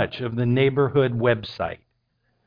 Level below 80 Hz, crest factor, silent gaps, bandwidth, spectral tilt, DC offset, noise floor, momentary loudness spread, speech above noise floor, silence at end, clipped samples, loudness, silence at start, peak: -54 dBFS; 16 dB; none; 5.2 kHz; -9 dB/octave; under 0.1%; -70 dBFS; 11 LU; 48 dB; 0.7 s; under 0.1%; -22 LUFS; 0 s; -8 dBFS